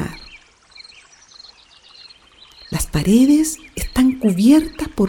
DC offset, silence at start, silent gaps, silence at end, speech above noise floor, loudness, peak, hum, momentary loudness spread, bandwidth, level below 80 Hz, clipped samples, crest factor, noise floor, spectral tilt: under 0.1%; 0 s; none; 0 s; 32 dB; -16 LUFS; -2 dBFS; none; 15 LU; 18 kHz; -36 dBFS; under 0.1%; 16 dB; -47 dBFS; -5.5 dB/octave